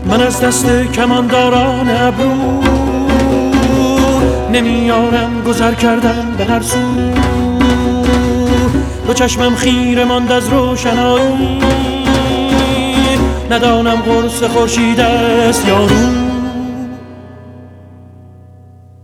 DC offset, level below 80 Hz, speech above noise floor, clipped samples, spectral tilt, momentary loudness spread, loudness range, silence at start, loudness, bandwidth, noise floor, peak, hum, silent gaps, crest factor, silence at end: under 0.1%; -24 dBFS; 27 dB; under 0.1%; -5 dB/octave; 4 LU; 2 LU; 0 s; -12 LUFS; 16 kHz; -38 dBFS; -2 dBFS; none; none; 10 dB; 1 s